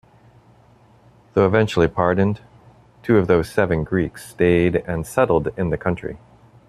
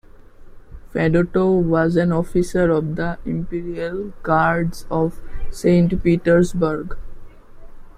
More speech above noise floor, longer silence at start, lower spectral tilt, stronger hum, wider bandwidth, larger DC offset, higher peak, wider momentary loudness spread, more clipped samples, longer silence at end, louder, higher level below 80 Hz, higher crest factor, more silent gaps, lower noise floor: first, 33 dB vs 22 dB; first, 1.35 s vs 0.2 s; about the same, -7.5 dB/octave vs -8 dB/octave; neither; about the same, 13.5 kHz vs 13 kHz; neither; about the same, -2 dBFS vs -4 dBFS; about the same, 11 LU vs 11 LU; neither; first, 0.5 s vs 0.05 s; about the same, -20 LUFS vs -19 LUFS; second, -44 dBFS vs -34 dBFS; about the same, 18 dB vs 16 dB; neither; first, -52 dBFS vs -41 dBFS